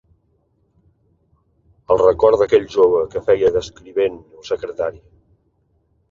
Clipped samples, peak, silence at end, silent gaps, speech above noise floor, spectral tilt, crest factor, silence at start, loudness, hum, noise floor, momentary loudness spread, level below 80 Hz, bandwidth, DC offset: under 0.1%; -2 dBFS; 1.15 s; none; 46 dB; -6 dB/octave; 18 dB; 1.9 s; -17 LUFS; none; -63 dBFS; 13 LU; -48 dBFS; 7.4 kHz; under 0.1%